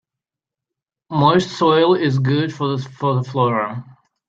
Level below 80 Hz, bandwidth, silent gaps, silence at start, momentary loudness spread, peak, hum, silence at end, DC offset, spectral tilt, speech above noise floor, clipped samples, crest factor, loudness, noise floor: -58 dBFS; 7.8 kHz; none; 1.1 s; 9 LU; 0 dBFS; none; 0.45 s; under 0.1%; -7 dB/octave; 70 dB; under 0.1%; 18 dB; -18 LUFS; -87 dBFS